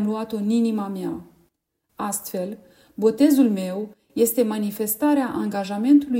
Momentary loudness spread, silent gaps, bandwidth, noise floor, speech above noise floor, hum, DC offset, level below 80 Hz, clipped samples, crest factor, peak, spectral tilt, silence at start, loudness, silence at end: 14 LU; none; 16.5 kHz; -72 dBFS; 51 dB; none; under 0.1%; -64 dBFS; under 0.1%; 16 dB; -6 dBFS; -5.5 dB/octave; 0 s; -22 LUFS; 0 s